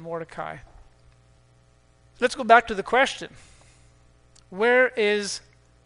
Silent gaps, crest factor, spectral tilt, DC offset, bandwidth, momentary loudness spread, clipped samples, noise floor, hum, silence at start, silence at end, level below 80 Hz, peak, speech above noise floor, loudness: none; 24 dB; -3 dB/octave; under 0.1%; 10.5 kHz; 19 LU; under 0.1%; -58 dBFS; 60 Hz at -60 dBFS; 0 s; 0.45 s; -56 dBFS; -2 dBFS; 36 dB; -22 LUFS